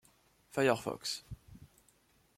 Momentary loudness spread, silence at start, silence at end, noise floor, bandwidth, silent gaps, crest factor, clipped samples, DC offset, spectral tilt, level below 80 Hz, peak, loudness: 20 LU; 0.55 s; 0.7 s; -70 dBFS; 16.5 kHz; none; 22 dB; under 0.1%; under 0.1%; -4 dB/octave; -64 dBFS; -16 dBFS; -35 LUFS